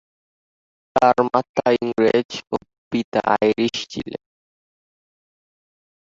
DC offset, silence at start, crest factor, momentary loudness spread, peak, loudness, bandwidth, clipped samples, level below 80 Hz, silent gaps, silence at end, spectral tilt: under 0.1%; 0.95 s; 20 dB; 12 LU; -2 dBFS; -20 LUFS; 7.8 kHz; under 0.1%; -58 dBFS; 1.49-1.54 s, 2.25-2.29 s, 2.78-2.91 s, 3.04-3.12 s; 1.95 s; -5 dB/octave